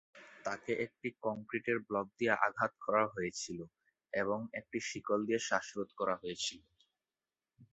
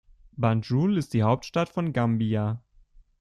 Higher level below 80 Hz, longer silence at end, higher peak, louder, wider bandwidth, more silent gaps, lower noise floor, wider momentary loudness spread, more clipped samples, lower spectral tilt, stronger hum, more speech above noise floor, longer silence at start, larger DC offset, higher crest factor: second, -74 dBFS vs -56 dBFS; second, 0.1 s vs 0.65 s; second, -12 dBFS vs -8 dBFS; second, -37 LUFS vs -26 LUFS; second, 8 kHz vs 11.5 kHz; neither; first, under -90 dBFS vs -56 dBFS; first, 10 LU vs 6 LU; neither; second, -3 dB/octave vs -8 dB/octave; neither; first, over 53 dB vs 31 dB; second, 0.15 s vs 0.35 s; neither; first, 26 dB vs 18 dB